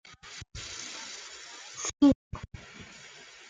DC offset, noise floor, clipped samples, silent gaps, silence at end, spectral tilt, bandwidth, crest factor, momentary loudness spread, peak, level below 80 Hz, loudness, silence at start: under 0.1%; -50 dBFS; under 0.1%; 2.15-2.31 s; 0 s; -4 dB/octave; 9.4 kHz; 22 dB; 23 LU; -12 dBFS; -54 dBFS; -30 LUFS; 0.05 s